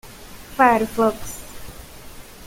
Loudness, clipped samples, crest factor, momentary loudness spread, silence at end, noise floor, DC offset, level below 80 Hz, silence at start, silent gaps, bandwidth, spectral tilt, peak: -18 LUFS; under 0.1%; 20 dB; 25 LU; 0 s; -39 dBFS; under 0.1%; -44 dBFS; 0.05 s; none; 17 kHz; -4.5 dB/octave; -2 dBFS